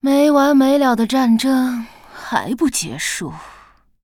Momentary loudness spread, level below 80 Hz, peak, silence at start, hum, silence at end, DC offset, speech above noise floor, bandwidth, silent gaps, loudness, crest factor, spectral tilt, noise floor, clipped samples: 17 LU; -50 dBFS; -4 dBFS; 0.05 s; none; 0.55 s; under 0.1%; 32 dB; 17 kHz; none; -16 LUFS; 14 dB; -4 dB/octave; -48 dBFS; under 0.1%